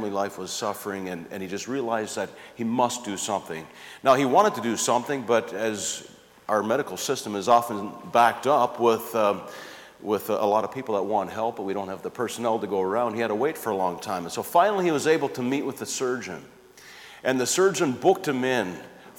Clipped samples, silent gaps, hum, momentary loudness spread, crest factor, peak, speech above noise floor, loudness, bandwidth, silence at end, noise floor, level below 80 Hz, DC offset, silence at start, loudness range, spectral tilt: under 0.1%; none; none; 13 LU; 18 dB; -6 dBFS; 23 dB; -25 LUFS; 19 kHz; 0.05 s; -48 dBFS; -70 dBFS; under 0.1%; 0 s; 4 LU; -4 dB/octave